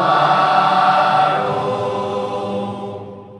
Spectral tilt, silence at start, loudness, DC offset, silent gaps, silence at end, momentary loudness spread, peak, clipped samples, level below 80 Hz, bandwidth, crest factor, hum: -5.5 dB/octave; 0 s; -16 LUFS; under 0.1%; none; 0 s; 13 LU; -2 dBFS; under 0.1%; -64 dBFS; 11 kHz; 14 dB; none